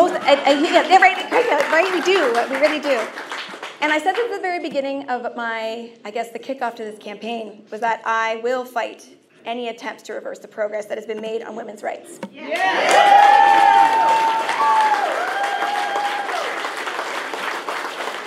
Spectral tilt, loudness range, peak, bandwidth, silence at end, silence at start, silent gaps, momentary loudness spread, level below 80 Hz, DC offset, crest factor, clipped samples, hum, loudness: -2 dB/octave; 12 LU; 0 dBFS; 15 kHz; 0 s; 0 s; none; 17 LU; -80 dBFS; under 0.1%; 18 dB; under 0.1%; none; -18 LUFS